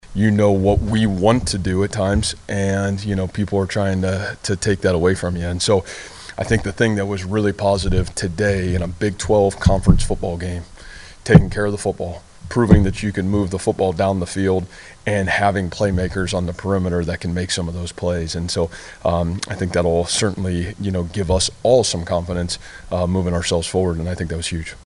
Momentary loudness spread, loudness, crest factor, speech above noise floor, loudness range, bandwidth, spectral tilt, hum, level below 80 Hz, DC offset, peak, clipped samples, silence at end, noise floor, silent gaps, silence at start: 9 LU; -19 LUFS; 18 dB; 20 dB; 3 LU; 11.5 kHz; -5.5 dB/octave; none; -30 dBFS; under 0.1%; 0 dBFS; under 0.1%; 0.05 s; -38 dBFS; none; 0.05 s